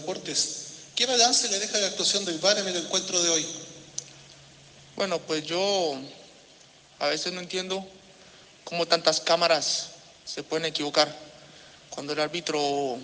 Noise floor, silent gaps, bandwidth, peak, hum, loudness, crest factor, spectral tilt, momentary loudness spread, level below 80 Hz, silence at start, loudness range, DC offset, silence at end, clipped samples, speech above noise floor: -54 dBFS; none; 10.5 kHz; -4 dBFS; none; -25 LUFS; 24 dB; -1.5 dB/octave; 16 LU; -72 dBFS; 0 s; 7 LU; under 0.1%; 0 s; under 0.1%; 28 dB